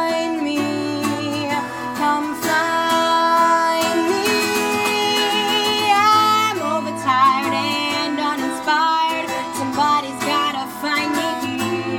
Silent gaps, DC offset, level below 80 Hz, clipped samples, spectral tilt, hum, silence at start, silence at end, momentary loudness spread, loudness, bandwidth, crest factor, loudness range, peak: none; under 0.1%; -60 dBFS; under 0.1%; -3 dB/octave; none; 0 s; 0 s; 7 LU; -18 LUFS; 19.5 kHz; 14 dB; 3 LU; -4 dBFS